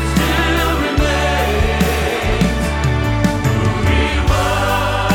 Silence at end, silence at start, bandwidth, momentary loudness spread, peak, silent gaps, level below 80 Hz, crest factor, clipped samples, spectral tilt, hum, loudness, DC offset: 0 s; 0 s; 19 kHz; 2 LU; 0 dBFS; none; -20 dBFS; 14 dB; under 0.1%; -5.5 dB/octave; none; -16 LUFS; under 0.1%